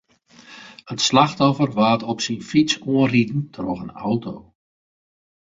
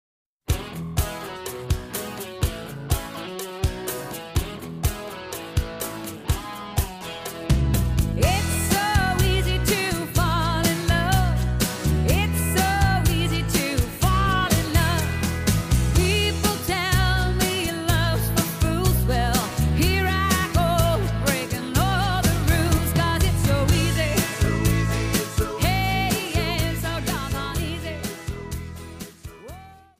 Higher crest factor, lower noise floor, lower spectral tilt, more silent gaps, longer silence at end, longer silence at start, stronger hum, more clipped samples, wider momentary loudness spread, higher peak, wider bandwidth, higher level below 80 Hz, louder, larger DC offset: about the same, 20 dB vs 16 dB; first, -49 dBFS vs -43 dBFS; about the same, -5 dB/octave vs -4.5 dB/octave; neither; first, 1.05 s vs 0.25 s; about the same, 0.5 s vs 0.5 s; neither; neither; first, 19 LU vs 12 LU; first, -2 dBFS vs -6 dBFS; second, 8 kHz vs 15.5 kHz; second, -58 dBFS vs -28 dBFS; first, -20 LUFS vs -23 LUFS; neither